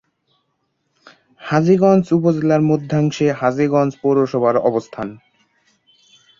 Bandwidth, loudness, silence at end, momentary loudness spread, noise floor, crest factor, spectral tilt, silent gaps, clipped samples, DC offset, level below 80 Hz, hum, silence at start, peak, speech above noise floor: 7.4 kHz; -16 LUFS; 1.25 s; 11 LU; -69 dBFS; 16 dB; -8 dB/octave; none; under 0.1%; under 0.1%; -58 dBFS; none; 1.4 s; -2 dBFS; 54 dB